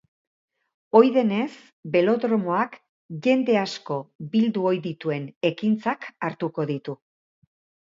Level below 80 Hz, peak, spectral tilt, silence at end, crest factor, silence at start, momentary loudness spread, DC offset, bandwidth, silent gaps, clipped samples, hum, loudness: -74 dBFS; -2 dBFS; -7 dB/octave; 0.9 s; 22 dB; 0.95 s; 12 LU; under 0.1%; 7.4 kHz; 1.73-1.83 s, 2.89-3.09 s, 4.15-4.19 s, 5.36-5.41 s; under 0.1%; none; -24 LUFS